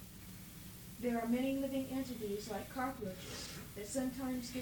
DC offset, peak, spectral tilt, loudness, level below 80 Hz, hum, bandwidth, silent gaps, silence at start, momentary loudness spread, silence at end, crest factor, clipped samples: under 0.1%; -26 dBFS; -4.5 dB/octave; -41 LUFS; -60 dBFS; none; 19.5 kHz; none; 0 s; 15 LU; 0 s; 16 dB; under 0.1%